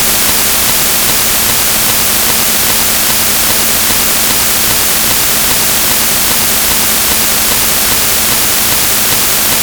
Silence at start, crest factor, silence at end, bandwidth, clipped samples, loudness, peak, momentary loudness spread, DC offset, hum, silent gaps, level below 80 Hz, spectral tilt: 0 s; 10 dB; 0 s; over 20 kHz; 0.2%; -7 LUFS; 0 dBFS; 0 LU; under 0.1%; none; none; -32 dBFS; -0.5 dB/octave